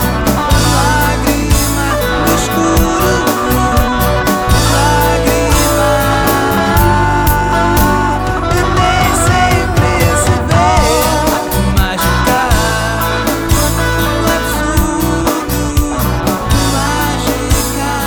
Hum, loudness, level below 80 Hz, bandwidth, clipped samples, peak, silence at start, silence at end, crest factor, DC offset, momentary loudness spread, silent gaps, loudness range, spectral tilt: none; -12 LUFS; -18 dBFS; over 20 kHz; under 0.1%; 0 dBFS; 0 s; 0 s; 12 dB; under 0.1%; 4 LU; none; 3 LU; -4.5 dB/octave